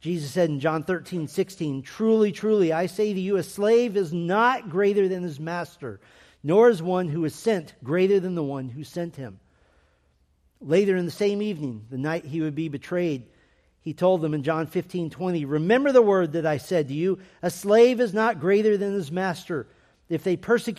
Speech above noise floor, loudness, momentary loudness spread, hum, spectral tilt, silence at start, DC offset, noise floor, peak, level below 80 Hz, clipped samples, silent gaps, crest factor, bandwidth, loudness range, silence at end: 42 dB; -24 LUFS; 14 LU; none; -6.5 dB/octave; 0.05 s; under 0.1%; -65 dBFS; -6 dBFS; -64 dBFS; under 0.1%; none; 18 dB; 14.5 kHz; 6 LU; 0.05 s